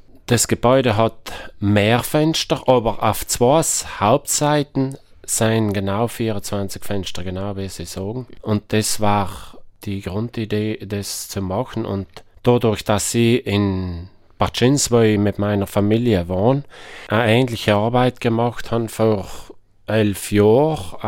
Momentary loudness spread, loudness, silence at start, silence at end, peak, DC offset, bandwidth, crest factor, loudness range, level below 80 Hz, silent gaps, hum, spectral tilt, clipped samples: 12 LU; -19 LUFS; 0.15 s; 0 s; 0 dBFS; under 0.1%; 17 kHz; 18 dB; 6 LU; -44 dBFS; none; none; -5 dB/octave; under 0.1%